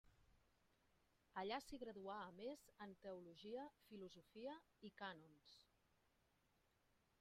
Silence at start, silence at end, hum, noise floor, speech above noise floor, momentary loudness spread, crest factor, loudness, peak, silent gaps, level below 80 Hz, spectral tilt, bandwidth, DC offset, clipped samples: 0.05 s; 1.55 s; none; -83 dBFS; 27 dB; 12 LU; 22 dB; -56 LUFS; -36 dBFS; none; -82 dBFS; -5 dB/octave; 14 kHz; under 0.1%; under 0.1%